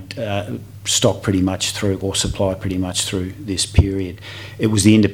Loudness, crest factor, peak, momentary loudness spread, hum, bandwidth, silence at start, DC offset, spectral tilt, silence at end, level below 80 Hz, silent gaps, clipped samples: -19 LUFS; 18 dB; 0 dBFS; 10 LU; none; 16.5 kHz; 0 s; 0.2%; -4.5 dB/octave; 0 s; -34 dBFS; none; under 0.1%